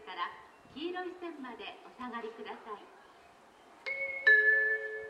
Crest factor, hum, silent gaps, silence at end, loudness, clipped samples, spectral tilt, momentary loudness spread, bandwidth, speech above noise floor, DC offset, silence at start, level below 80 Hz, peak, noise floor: 20 dB; none; none; 0 s; -29 LUFS; under 0.1%; -3.5 dB/octave; 23 LU; 9.8 kHz; 16 dB; under 0.1%; 0 s; -78 dBFS; -14 dBFS; -59 dBFS